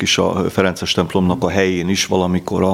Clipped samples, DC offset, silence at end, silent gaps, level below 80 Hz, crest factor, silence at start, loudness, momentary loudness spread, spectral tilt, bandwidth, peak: under 0.1%; under 0.1%; 0 s; none; -50 dBFS; 16 dB; 0 s; -17 LUFS; 2 LU; -4.5 dB/octave; 15.5 kHz; 0 dBFS